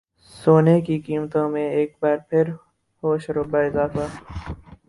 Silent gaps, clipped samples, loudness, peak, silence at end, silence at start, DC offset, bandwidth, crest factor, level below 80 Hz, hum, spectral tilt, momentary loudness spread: none; under 0.1%; -21 LUFS; -2 dBFS; 0.15 s; 0.35 s; under 0.1%; 11.5 kHz; 20 dB; -46 dBFS; none; -8.5 dB/octave; 18 LU